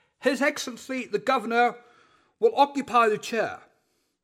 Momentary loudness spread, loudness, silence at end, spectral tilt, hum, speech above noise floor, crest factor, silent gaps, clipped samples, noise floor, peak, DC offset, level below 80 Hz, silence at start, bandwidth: 10 LU; -25 LUFS; 0.65 s; -3.5 dB/octave; none; 47 dB; 18 dB; none; under 0.1%; -72 dBFS; -8 dBFS; under 0.1%; -76 dBFS; 0.2 s; 16 kHz